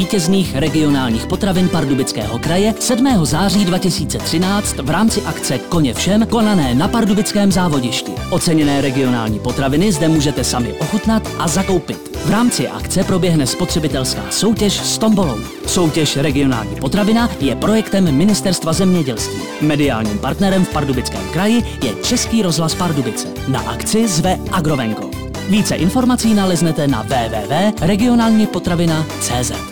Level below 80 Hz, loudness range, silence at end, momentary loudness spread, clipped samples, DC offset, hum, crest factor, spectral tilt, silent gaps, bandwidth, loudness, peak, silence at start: -32 dBFS; 2 LU; 0 s; 5 LU; under 0.1%; 1%; none; 10 dB; -5 dB/octave; none; over 20 kHz; -16 LUFS; -6 dBFS; 0 s